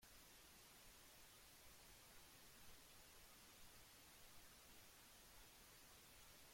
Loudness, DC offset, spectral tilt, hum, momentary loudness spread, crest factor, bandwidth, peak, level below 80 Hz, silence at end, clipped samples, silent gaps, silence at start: -65 LUFS; under 0.1%; -1.5 dB/octave; none; 0 LU; 16 dB; 16.5 kHz; -50 dBFS; -76 dBFS; 0 s; under 0.1%; none; 0 s